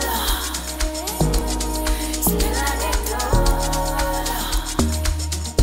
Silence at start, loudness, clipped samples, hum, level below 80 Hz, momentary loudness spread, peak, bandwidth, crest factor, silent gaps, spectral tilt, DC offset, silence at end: 0 s; -22 LUFS; under 0.1%; none; -24 dBFS; 4 LU; -4 dBFS; 16.5 kHz; 16 dB; none; -3.5 dB/octave; under 0.1%; 0 s